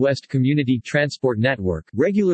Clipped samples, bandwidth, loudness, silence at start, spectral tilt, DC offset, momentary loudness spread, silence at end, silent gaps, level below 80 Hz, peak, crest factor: under 0.1%; 8.6 kHz; -21 LUFS; 0 s; -7 dB/octave; under 0.1%; 3 LU; 0 s; none; -52 dBFS; -6 dBFS; 14 dB